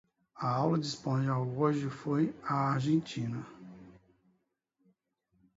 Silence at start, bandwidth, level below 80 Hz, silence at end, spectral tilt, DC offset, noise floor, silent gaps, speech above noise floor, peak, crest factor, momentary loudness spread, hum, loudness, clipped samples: 0.35 s; 8 kHz; -70 dBFS; 1.65 s; -7 dB/octave; under 0.1%; -79 dBFS; none; 47 dB; -16 dBFS; 18 dB; 11 LU; none; -32 LUFS; under 0.1%